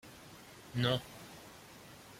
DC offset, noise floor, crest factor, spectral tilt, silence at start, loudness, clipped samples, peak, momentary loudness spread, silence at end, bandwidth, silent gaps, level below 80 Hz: under 0.1%; -55 dBFS; 24 dB; -5 dB/octave; 0.05 s; -35 LUFS; under 0.1%; -18 dBFS; 20 LU; 0 s; 16.5 kHz; none; -66 dBFS